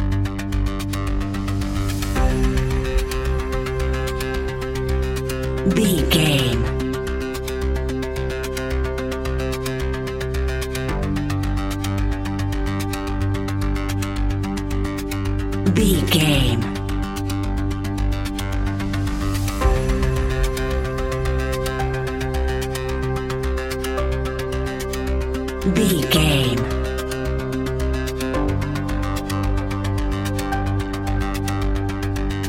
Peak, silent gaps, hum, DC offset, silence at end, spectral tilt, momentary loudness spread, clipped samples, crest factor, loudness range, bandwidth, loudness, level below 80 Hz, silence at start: -2 dBFS; none; none; under 0.1%; 0 s; -5.5 dB/octave; 7 LU; under 0.1%; 18 dB; 4 LU; 17 kHz; -22 LUFS; -26 dBFS; 0 s